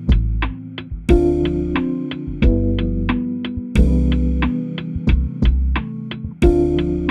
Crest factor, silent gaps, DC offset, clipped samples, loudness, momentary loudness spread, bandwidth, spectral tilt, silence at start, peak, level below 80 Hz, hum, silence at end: 16 dB; none; under 0.1%; under 0.1%; -19 LUFS; 10 LU; 9 kHz; -8.5 dB/octave; 0 s; -2 dBFS; -20 dBFS; none; 0 s